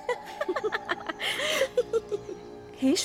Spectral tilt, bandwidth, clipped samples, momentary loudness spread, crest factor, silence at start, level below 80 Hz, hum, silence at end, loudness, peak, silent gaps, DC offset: -2.5 dB/octave; 17 kHz; under 0.1%; 12 LU; 16 dB; 0 s; -62 dBFS; none; 0 s; -29 LUFS; -14 dBFS; none; under 0.1%